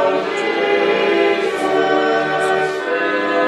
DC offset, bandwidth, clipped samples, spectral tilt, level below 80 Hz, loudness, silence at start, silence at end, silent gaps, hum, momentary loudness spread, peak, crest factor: under 0.1%; 12 kHz; under 0.1%; -4 dB/octave; -62 dBFS; -17 LUFS; 0 s; 0 s; none; none; 4 LU; -4 dBFS; 12 dB